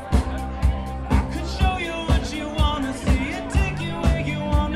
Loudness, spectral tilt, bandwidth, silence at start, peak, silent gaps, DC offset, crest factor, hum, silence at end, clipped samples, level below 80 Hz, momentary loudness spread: -24 LUFS; -6 dB/octave; 12.5 kHz; 0 s; -6 dBFS; none; under 0.1%; 16 dB; none; 0 s; under 0.1%; -26 dBFS; 3 LU